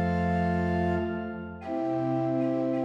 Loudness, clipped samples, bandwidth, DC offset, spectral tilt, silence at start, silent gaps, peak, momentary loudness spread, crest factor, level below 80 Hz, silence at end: -29 LUFS; under 0.1%; 7.4 kHz; under 0.1%; -9 dB/octave; 0 s; none; -16 dBFS; 8 LU; 12 dB; -54 dBFS; 0 s